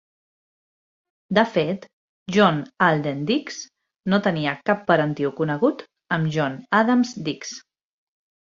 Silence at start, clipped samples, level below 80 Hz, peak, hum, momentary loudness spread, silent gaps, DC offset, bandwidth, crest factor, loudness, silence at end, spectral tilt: 1.3 s; under 0.1%; -64 dBFS; -2 dBFS; none; 15 LU; 1.93-2.26 s; under 0.1%; 7.6 kHz; 22 dB; -22 LUFS; 0.85 s; -6 dB/octave